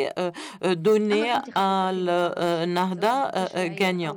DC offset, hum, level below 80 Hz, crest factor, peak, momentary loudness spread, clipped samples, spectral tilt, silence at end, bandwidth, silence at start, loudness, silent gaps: under 0.1%; none; -74 dBFS; 14 dB; -10 dBFS; 6 LU; under 0.1%; -5.5 dB/octave; 0 s; 20 kHz; 0 s; -24 LUFS; none